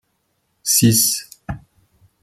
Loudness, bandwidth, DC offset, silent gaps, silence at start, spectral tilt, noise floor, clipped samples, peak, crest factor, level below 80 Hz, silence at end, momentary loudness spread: -15 LUFS; 16 kHz; under 0.1%; none; 0.65 s; -3 dB/octave; -69 dBFS; under 0.1%; -2 dBFS; 18 dB; -48 dBFS; 0.65 s; 20 LU